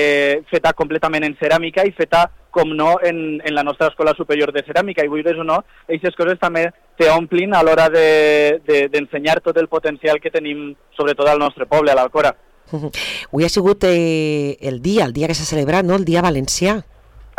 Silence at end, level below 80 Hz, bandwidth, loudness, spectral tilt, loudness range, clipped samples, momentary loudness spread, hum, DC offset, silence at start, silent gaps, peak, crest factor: 0.15 s; -44 dBFS; 16.5 kHz; -16 LUFS; -5 dB/octave; 4 LU; under 0.1%; 8 LU; none; under 0.1%; 0 s; none; -6 dBFS; 10 dB